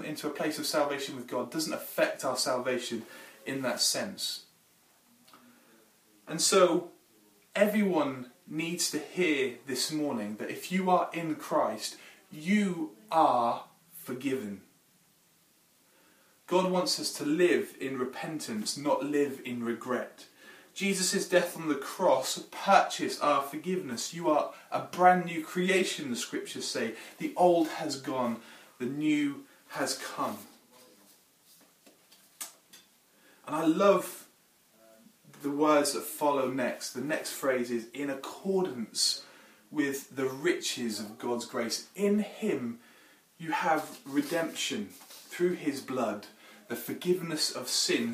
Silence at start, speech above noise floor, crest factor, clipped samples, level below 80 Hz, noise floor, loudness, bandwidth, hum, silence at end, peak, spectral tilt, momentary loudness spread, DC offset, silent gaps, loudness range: 0 s; 36 dB; 24 dB; under 0.1%; -84 dBFS; -66 dBFS; -30 LUFS; 15.5 kHz; none; 0 s; -6 dBFS; -3.5 dB/octave; 14 LU; under 0.1%; none; 5 LU